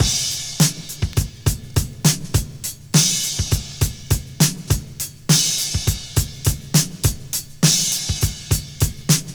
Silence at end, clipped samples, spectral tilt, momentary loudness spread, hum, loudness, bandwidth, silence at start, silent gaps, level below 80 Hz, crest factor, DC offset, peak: 0 s; under 0.1%; -3 dB/octave; 9 LU; none; -20 LUFS; over 20 kHz; 0 s; none; -32 dBFS; 18 dB; 0.1%; -2 dBFS